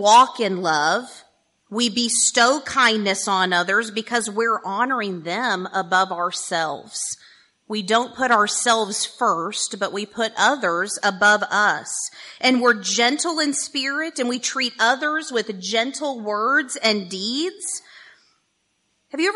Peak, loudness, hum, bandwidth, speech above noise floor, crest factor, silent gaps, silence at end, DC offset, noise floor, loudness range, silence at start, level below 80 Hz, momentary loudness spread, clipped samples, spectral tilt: -4 dBFS; -20 LUFS; none; 11.5 kHz; 49 dB; 18 dB; none; 0 s; under 0.1%; -69 dBFS; 4 LU; 0 s; -72 dBFS; 10 LU; under 0.1%; -1.5 dB/octave